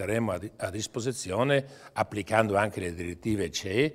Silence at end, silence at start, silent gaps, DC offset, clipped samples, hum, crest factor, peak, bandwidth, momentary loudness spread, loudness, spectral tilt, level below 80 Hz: 0 s; 0 s; none; under 0.1%; under 0.1%; none; 22 dB; -6 dBFS; 16 kHz; 9 LU; -29 LUFS; -5 dB/octave; -56 dBFS